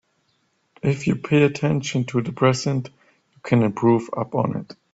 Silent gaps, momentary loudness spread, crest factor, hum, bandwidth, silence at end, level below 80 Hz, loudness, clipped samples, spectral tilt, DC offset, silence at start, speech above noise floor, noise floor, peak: none; 9 LU; 20 dB; none; 8 kHz; 0.2 s; -58 dBFS; -21 LUFS; under 0.1%; -6.5 dB/octave; under 0.1%; 0.85 s; 47 dB; -68 dBFS; -2 dBFS